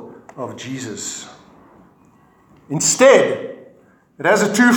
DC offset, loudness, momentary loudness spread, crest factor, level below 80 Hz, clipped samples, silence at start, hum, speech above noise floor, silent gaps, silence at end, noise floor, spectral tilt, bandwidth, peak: under 0.1%; -16 LUFS; 21 LU; 18 dB; -66 dBFS; under 0.1%; 0 s; none; 36 dB; none; 0 s; -52 dBFS; -3.5 dB/octave; 19 kHz; 0 dBFS